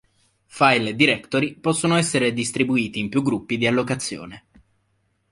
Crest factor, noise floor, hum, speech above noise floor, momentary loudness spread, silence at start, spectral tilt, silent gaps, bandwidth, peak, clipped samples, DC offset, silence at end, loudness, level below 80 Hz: 20 dB; -68 dBFS; none; 47 dB; 8 LU; 0.55 s; -4.5 dB/octave; none; 11.5 kHz; -2 dBFS; under 0.1%; under 0.1%; 0.95 s; -21 LUFS; -58 dBFS